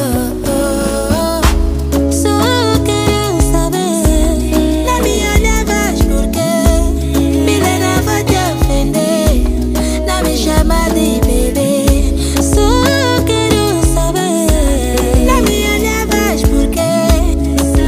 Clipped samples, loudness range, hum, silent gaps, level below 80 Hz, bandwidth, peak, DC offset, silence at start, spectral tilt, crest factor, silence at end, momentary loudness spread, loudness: under 0.1%; 1 LU; none; none; -16 dBFS; 16 kHz; 0 dBFS; under 0.1%; 0 s; -5 dB/octave; 12 dB; 0 s; 3 LU; -13 LUFS